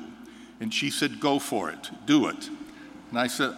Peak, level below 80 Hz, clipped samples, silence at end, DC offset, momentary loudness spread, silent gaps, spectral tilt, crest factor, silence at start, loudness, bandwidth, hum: -10 dBFS; -68 dBFS; under 0.1%; 0 s; under 0.1%; 21 LU; none; -3.5 dB/octave; 20 dB; 0 s; -27 LUFS; 16 kHz; none